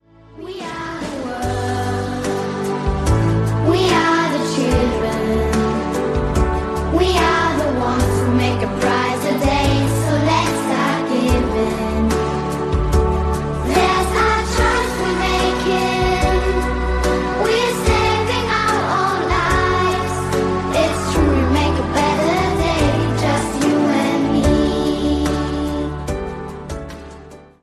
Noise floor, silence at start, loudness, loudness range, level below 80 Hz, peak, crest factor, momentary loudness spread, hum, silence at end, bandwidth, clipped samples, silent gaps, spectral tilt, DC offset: -39 dBFS; 0.35 s; -18 LUFS; 2 LU; -26 dBFS; -2 dBFS; 16 dB; 6 LU; none; 0.2 s; 14 kHz; under 0.1%; none; -5.5 dB/octave; under 0.1%